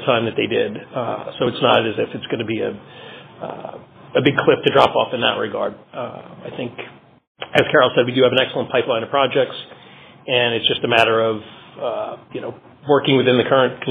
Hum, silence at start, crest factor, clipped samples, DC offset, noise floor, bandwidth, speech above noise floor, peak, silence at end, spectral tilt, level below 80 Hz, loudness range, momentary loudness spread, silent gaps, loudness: none; 0 s; 18 dB; under 0.1%; under 0.1%; -44 dBFS; 4.8 kHz; 25 dB; 0 dBFS; 0 s; -2.5 dB/octave; -60 dBFS; 3 LU; 19 LU; 7.27-7.35 s; -18 LUFS